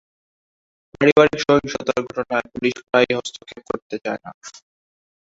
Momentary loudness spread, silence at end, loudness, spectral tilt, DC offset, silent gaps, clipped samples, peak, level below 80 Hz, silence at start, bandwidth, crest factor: 19 LU; 0.75 s; -20 LUFS; -5 dB/octave; under 0.1%; 1.12-1.16 s, 3.82-3.90 s, 4.34-4.41 s; under 0.1%; -2 dBFS; -56 dBFS; 1 s; 8 kHz; 20 dB